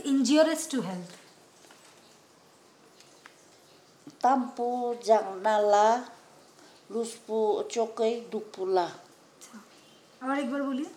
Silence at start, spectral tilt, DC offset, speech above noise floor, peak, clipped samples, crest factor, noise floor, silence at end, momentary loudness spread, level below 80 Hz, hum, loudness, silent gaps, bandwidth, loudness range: 0 s; -4 dB/octave; under 0.1%; 31 dB; -10 dBFS; under 0.1%; 20 dB; -58 dBFS; 0 s; 17 LU; under -90 dBFS; none; -28 LUFS; none; 16 kHz; 7 LU